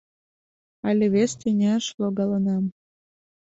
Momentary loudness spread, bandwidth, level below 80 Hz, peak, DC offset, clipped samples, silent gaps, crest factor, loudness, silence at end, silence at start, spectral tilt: 6 LU; 8 kHz; -64 dBFS; -10 dBFS; under 0.1%; under 0.1%; 1.94-1.98 s; 14 dB; -23 LUFS; 0.7 s; 0.85 s; -6 dB/octave